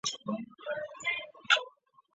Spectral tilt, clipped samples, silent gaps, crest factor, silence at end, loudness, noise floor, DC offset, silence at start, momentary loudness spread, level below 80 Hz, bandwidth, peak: 0 dB/octave; under 0.1%; none; 26 dB; 0.45 s; -32 LUFS; -55 dBFS; under 0.1%; 0.05 s; 11 LU; -80 dBFS; 8 kHz; -10 dBFS